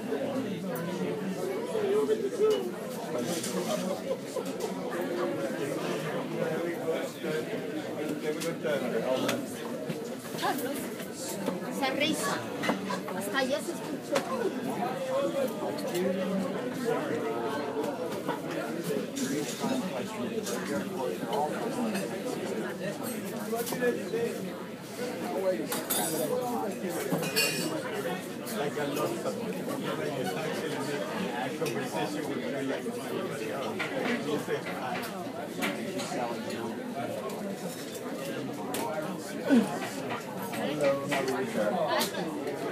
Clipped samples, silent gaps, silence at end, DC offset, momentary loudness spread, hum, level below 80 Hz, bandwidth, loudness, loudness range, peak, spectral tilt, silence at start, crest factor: under 0.1%; none; 0 s; under 0.1%; 7 LU; none; -74 dBFS; 15.5 kHz; -32 LUFS; 3 LU; -12 dBFS; -4.5 dB/octave; 0 s; 20 dB